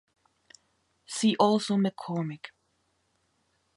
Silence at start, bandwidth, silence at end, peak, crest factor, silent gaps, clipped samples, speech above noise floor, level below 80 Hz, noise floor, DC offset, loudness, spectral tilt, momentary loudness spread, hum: 1.1 s; 11.5 kHz; 1.3 s; -8 dBFS; 22 dB; none; under 0.1%; 47 dB; -76 dBFS; -73 dBFS; under 0.1%; -27 LUFS; -5.5 dB/octave; 17 LU; none